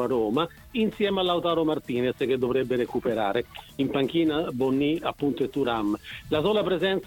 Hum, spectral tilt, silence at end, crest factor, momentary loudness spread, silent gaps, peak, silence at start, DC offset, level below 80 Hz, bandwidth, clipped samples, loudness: none; -6.5 dB/octave; 0 s; 16 dB; 5 LU; none; -10 dBFS; 0 s; under 0.1%; -54 dBFS; 18 kHz; under 0.1%; -26 LUFS